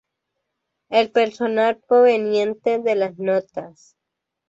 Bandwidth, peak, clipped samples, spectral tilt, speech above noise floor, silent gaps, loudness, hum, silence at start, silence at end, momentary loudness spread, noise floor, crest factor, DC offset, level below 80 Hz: 7.8 kHz; -4 dBFS; under 0.1%; -5.5 dB/octave; 62 dB; none; -19 LUFS; none; 0.9 s; 0.8 s; 7 LU; -81 dBFS; 16 dB; under 0.1%; -70 dBFS